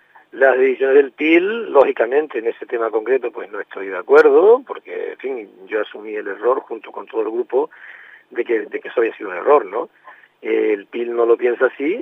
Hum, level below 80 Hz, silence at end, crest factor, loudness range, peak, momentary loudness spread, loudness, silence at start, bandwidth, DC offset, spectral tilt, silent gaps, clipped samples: 50 Hz at -80 dBFS; -76 dBFS; 0 s; 18 dB; 7 LU; 0 dBFS; 14 LU; -18 LUFS; 0.35 s; 5.4 kHz; under 0.1%; -6 dB/octave; none; under 0.1%